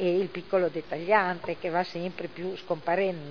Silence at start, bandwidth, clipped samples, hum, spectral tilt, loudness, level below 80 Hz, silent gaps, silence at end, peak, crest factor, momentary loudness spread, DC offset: 0 s; 5.4 kHz; under 0.1%; none; -7.5 dB/octave; -29 LUFS; -68 dBFS; none; 0 s; -8 dBFS; 20 dB; 11 LU; 0.4%